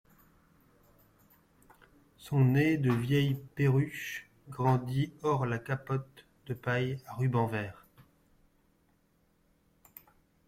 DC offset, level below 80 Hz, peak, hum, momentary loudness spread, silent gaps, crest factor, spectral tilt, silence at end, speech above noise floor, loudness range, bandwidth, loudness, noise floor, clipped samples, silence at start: under 0.1%; -64 dBFS; -16 dBFS; none; 13 LU; none; 18 dB; -7.5 dB/octave; 2.75 s; 40 dB; 7 LU; 15.5 kHz; -31 LUFS; -70 dBFS; under 0.1%; 2.2 s